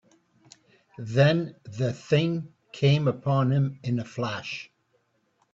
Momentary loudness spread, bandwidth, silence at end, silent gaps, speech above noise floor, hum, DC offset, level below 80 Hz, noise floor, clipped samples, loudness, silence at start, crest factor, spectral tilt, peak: 15 LU; 7.6 kHz; 0.9 s; none; 45 dB; none; under 0.1%; -64 dBFS; -70 dBFS; under 0.1%; -26 LUFS; 1 s; 18 dB; -7 dB/octave; -8 dBFS